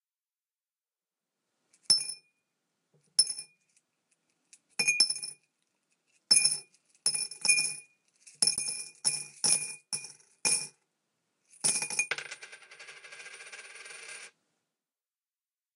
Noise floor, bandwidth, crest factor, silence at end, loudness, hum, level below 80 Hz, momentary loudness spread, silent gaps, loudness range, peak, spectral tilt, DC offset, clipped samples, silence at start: under -90 dBFS; 15.5 kHz; 26 dB; 1.5 s; -28 LUFS; none; -84 dBFS; 22 LU; none; 7 LU; -8 dBFS; 2 dB/octave; under 0.1%; under 0.1%; 1.9 s